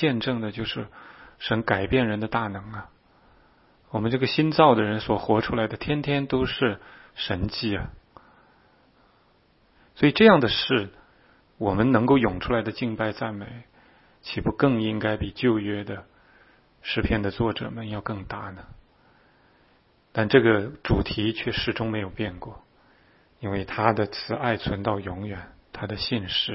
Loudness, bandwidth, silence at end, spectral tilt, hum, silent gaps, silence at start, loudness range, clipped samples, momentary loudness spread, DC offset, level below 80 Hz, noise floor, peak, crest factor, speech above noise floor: -24 LUFS; 5.8 kHz; 0 s; -10 dB/octave; none; none; 0 s; 8 LU; under 0.1%; 18 LU; under 0.1%; -46 dBFS; -61 dBFS; -2 dBFS; 24 dB; 37 dB